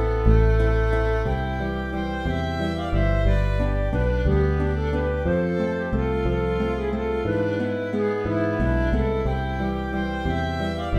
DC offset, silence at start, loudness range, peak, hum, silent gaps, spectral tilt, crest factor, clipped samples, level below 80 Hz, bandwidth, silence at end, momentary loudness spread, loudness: under 0.1%; 0 s; 1 LU; -4 dBFS; none; none; -8.5 dB/octave; 18 dB; under 0.1%; -26 dBFS; 7 kHz; 0 s; 5 LU; -24 LUFS